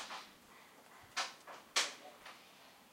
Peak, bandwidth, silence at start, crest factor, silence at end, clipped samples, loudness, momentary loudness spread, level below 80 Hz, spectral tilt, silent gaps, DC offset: -18 dBFS; 16 kHz; 0 s; 26 dB; 0 s; under 0.1%; -40 LUFS; 23 LU; -84 dBFS; 1.5 dB/octave; none; under 0.1%